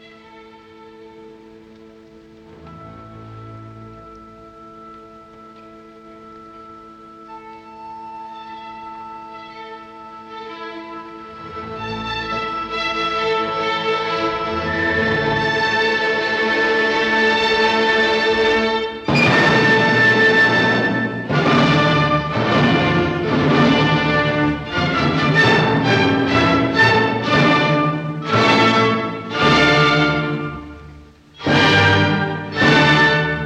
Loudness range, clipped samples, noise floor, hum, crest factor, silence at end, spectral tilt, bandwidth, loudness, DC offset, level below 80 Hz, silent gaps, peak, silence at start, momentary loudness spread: 19 LU; under 0.1%; -43 dBFS; none; 16 dB; 0 s; -5.5 dB/octave; 9.4 kHz; -16 LUFS; under 0.1%; -44 dBFS; none; -2 dBFS; 0.35 s; 22 LU